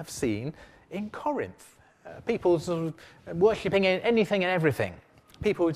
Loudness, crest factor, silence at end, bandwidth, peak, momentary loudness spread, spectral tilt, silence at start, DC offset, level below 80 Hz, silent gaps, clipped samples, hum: -27 LUFS; 18 dB; 0 s; 15.5 kHz; -10 dBFS; 14 LU; -6 dB/octave; 0 s; under 0.1%; -56 dBFS; none; under 0.1%; none